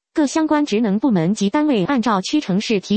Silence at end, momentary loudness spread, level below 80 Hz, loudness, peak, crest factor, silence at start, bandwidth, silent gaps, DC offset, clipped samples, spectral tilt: 0 s; 2 LU; -56 dBFS; -18 LUFS; -4 dBFS; 14 dB; 0.15 s; 8.8 kHz; none; under 0.1%; under 0.1%; -5.5 dB/octave